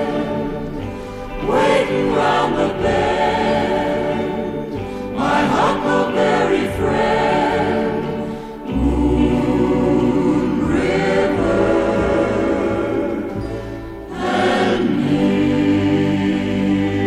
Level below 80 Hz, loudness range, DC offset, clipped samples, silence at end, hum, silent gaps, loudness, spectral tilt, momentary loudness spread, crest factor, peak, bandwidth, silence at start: -34 dBFS; 2 LU; under 0.1%; under 0.1%; 0 s; none; none; -18 LUFS; -6.5 dB/octave; 10 LU; 14 dB; -4 dBFS; 13 kHz; 0 s